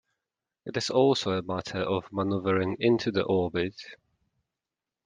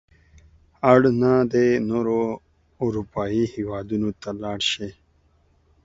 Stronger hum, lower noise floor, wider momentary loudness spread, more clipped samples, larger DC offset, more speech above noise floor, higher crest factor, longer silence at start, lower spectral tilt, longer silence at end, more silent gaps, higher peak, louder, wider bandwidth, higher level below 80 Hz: neither; first, -89 dBFS vs -61 dBFS; about the same, 11 LU vs 13 LU; neither; neither; first, 62 dB vs 40 dB; about the same, 20 dB vs 22 dB; second, 0.65 s vs 0.85 s; about the same, -5.5 dB/octave vs -6 dB/octave; first, 1.1 s vs 0.9 s; neither; second, -10 dBFS vs 0 dBFS; second, -27 LUFS vs -22 LUFS; first, 9.8 kHz vs 7.8 kHz; second, -66 dBFS vs -52 dBFS